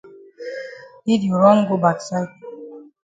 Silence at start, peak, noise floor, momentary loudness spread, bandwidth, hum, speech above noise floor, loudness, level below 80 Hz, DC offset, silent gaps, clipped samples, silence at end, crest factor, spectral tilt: 0.05 s; -2 dBFS; -38 dBFS; 23 LU; 9.2 kHz; none; 21 dB; -18 LUFS; -64 dBFS; under 0.1%; none; under 0.1%; 0.25 s; 20 dB; -7 dB/octave